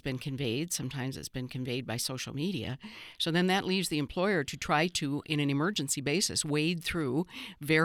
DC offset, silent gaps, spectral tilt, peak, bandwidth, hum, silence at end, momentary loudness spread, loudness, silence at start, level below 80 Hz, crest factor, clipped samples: under 0.1%; none; -4 dB/octave; -14 dBFS; over 20 kHz; none; 0 s; 9 LU; -31 LUFS; 0.05 s; -58 dBFS; 18 dB; under 0.1%